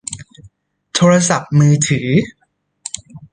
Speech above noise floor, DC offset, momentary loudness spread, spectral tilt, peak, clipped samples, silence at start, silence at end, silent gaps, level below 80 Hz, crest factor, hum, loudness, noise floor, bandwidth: 36 dB; under 0.1%; 18 LU; -5 dB/octave; -2 dBFS; under 0.1%; 0.1 s; 0.15 s; none; -50 dBFS; 14 dB; none; -14 LUFS; -48 dBFS; 10 kHz